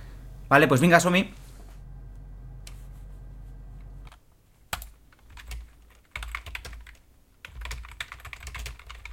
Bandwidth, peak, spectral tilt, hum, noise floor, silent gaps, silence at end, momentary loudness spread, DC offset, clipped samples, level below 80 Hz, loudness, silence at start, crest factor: 16.5 kHz; -2 dBFS; -5 dB/octave; none; -58 dBFS; none; 0 s; 28 LU; under 0.1%; under 0.1%; -44 dBFS; -24 LUFS; 0 s; 26 dB